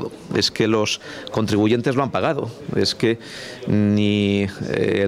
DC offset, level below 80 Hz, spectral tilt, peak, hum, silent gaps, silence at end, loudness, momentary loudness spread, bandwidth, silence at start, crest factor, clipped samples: under 0.1%; -54 dBFS; -5.5 dB/octave; -6 dBFS; none; none; 0 s; -20 LUFS; 9 LU; 14 kHz; 0 s; 14 dB; under 0.1%